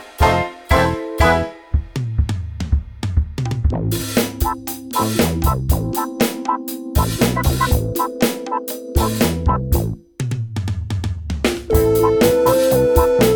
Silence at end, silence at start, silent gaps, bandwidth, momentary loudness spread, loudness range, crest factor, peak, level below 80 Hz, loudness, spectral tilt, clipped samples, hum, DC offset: 0 s; 0 s; none; 19.5 kHz; 10 LU; 3 LU; 18 dB; 0 dBFS; -24 dBFS; -19 LUFS; -5.5 dB/octave; under 0.1%; none; under 0.1%